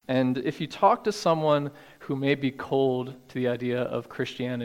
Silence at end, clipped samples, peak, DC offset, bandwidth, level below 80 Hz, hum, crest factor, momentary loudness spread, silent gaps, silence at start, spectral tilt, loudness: 0 s; under 0.1%; -8 dBFS; under 0.1%; 16 kHz; -66 dBFS; none; 20 dB; 10 LU; none; 0.1 s; -6.5 dB/octave; -27 LUFS